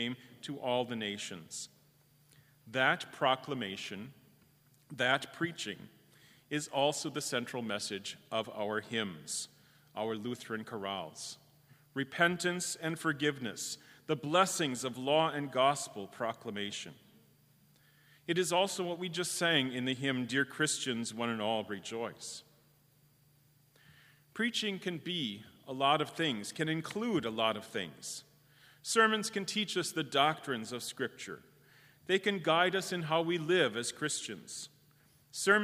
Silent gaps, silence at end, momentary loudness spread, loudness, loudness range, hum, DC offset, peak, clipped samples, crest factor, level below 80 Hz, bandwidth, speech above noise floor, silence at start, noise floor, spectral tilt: none; 0 s; 15 LU; -34 LUFS; 6 LU; none; under 0.1%; -12 dBFS; under 0.1%; 24 dB; -80 dBFS; 15.5 kHz; 33 dB; 0 s; -67 dBFS; -3 dB/octave